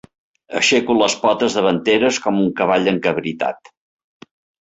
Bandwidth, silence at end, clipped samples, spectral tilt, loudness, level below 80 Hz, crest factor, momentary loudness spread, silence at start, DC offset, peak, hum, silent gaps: 8.2 kHz; 1.1 s; under 0.1%; -4 dB/octave; -17 LUFS; -58 dBFS; 16 dB; 8 LU; 0.5 s; under 0.1%; -2 dBFS; none; none